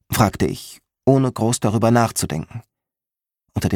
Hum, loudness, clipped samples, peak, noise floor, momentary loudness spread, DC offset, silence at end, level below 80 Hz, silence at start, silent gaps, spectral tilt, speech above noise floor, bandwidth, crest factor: none; -19 LUFS; under 0.1%; 0 dBFS; -89 dBFS; 17 LU; under 0.1%; 0 s; -44 dBFS; 0.1 s; none; -5.5 dB/octave; 70 dB; 19 kHz; 20 dB